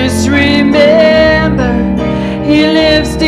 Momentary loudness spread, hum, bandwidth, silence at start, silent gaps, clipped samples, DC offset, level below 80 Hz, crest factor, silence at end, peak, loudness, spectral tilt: 7 LU; none; 14 kHz; 0 s; none; under 0.1%; under 0.1%; -24 dBFS; 8 dB; 0 s; 0 dBFS; -9 LUFS; -5.5 dB/octave